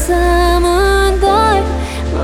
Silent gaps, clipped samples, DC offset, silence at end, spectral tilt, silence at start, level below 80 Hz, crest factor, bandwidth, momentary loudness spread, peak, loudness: none; under 0.1%; under 0.1%; 0 s; -5 dB/octave; 0 s; -18 dBFS; 12 dB; 16.5 kHz; 7 LU; 0 dBFS; -12 LUFS